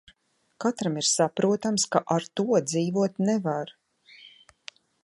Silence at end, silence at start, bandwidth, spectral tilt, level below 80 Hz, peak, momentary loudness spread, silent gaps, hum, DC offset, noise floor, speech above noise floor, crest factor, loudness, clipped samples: 0.75 s; 0.6 s; 11.5 kHz; -4.5 dB/octave; -72 dBFS; -6 dBFS; 19 LU; none; none; under 0.1%; -67 dBFS; 42 dB; 22 dB; -25 LUFS; under 0.1%